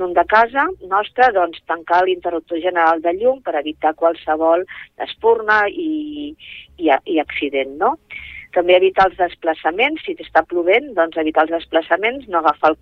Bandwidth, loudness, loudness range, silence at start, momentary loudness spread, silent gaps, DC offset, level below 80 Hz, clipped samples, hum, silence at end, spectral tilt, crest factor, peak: 6.6 kHz; -17 LUFS; 2 LU; 0 s; 11 LU; none; under 0.1%; -52 dBFS; under 0.1%; none; 0.05 s; -5.5 dB/octave; 16 dB; -2 dBFS